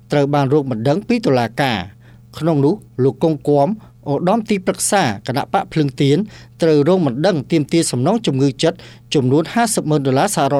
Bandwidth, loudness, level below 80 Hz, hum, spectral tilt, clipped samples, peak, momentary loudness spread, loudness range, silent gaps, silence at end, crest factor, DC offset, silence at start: 15 kHz; -17 LUFS; -52 dBFS; none; -5.5 dB/octave; under 0.1%; -2 dBFS; 5 LU; 2 LU; none; 0 s; 14 dB; under 0.1%; 0.1 s